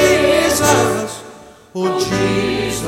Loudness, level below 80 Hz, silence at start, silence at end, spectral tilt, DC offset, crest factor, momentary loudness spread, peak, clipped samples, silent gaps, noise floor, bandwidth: -15 LUFS; -40 dBFS; 0 s; 0 s; -4 dB/octave; under 0.1%; 16 dB; 13 LU; 0 dBFS; under 0.1%; none; -39 dBFS; 16.5 kHz